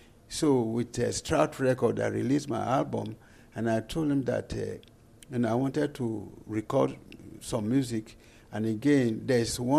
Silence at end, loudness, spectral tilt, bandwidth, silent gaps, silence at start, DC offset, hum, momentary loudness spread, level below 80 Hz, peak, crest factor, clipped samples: 0 s; -29 LUFS; -6 dB/octave; 15 kHz; none; 0.3 s; under 0.1%; none; 13 LU; -54 dBFS; -12 dBFS; 18 dB; under 0.1%